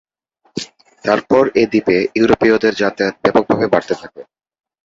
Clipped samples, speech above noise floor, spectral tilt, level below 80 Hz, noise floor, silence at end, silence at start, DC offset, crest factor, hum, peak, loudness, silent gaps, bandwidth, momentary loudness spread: under 0.1%; 46 dB; -6 dB/octave; -48 dBFS; -61 dBFS; 0.65 s; 0.55 s; under 0.1%; 16 dB; none; 0 dBFS; -15 LUFS; none; 7.8 kHz; 15 LU